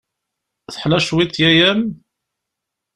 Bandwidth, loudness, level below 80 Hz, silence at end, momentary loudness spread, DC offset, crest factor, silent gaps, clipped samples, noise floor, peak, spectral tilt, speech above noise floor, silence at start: 11.5 kHz; -15 LUFS; -48 dBFS; 1 s; 14 LU; under 0.1%; 18 dB; none; under 0.1%; -81 dBFS; 0 dBFS; -5 dB/octave; 66 dB; 0.7 s